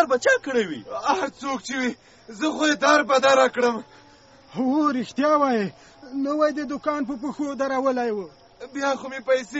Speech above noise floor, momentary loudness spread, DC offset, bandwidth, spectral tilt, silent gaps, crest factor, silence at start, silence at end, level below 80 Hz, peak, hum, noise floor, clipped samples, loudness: 29 dB; 13 LU; under 0.1%; 8 kHz; -2 dB/octave; none; 20 dB; 0 s; 0 s; -64 dBFS; -4 dBFS; none; -51 dBFS; under 0.1%; -23 LUFS